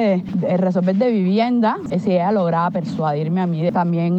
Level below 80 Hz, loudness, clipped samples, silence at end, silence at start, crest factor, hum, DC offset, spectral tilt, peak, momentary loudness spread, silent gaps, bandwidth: -58 dBFS; -19 LUFS; under 0.1%; 0 s; 0 s; 10 dB; none; under 0.1%; -9 dB/octave; -6 dBFS; 4 LU; none; 7.6 kHz